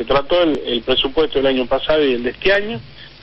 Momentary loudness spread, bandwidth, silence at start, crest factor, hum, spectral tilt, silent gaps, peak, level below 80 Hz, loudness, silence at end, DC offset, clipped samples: 3 LU; 6.6 kHz; 0 s; 14 dB; none; -6.5 dB/octave; none; -4 dBFS; -36 dBFS; -17 LUFS; 0.1 s; under 0.1%; under 0.1%